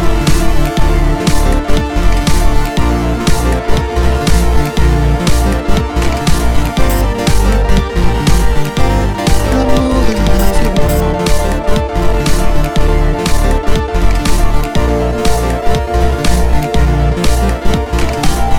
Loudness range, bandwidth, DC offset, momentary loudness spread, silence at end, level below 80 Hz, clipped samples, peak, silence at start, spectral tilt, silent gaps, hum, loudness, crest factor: 1 LU; 17.5 kHz; 10%; 3 LU; 0 s; -14 dBFS; under 0.1%; 0 dBFS; 0 s; -5.5 dB/octave; none; none; -14 LUFS; 10 dB